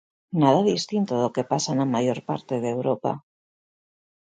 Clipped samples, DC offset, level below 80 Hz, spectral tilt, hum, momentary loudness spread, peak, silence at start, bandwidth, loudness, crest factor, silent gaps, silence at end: under 0.1%; under 0.1%; -68 dBFS; -6 dB/octave; none; 10 LU; -4 dBFS; 0.3 s; 9.4 kHz; -24 LUFS; 20 dB; none; 1.05 s